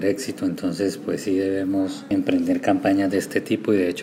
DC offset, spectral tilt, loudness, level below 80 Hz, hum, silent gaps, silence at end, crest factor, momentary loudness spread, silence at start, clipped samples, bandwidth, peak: under 0.1%; -5.5 dB/octave; -23 LUFS; -64 dBFS; none; none; 0 s; 16 dB; 5 LU; 0 s; under 0.1%; 16 kHz; -6 dBFS